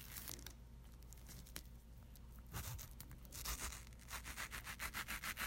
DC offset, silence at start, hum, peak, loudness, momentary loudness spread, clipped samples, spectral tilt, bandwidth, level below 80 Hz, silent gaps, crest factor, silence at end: under 0.1%; 0 s; none; -26 dBFS; -50 LUFS; 15 LU; under 0.1%; -2 dB/octave; 16.5 kHz; -56 dBFS; none; 26 dB; 0 s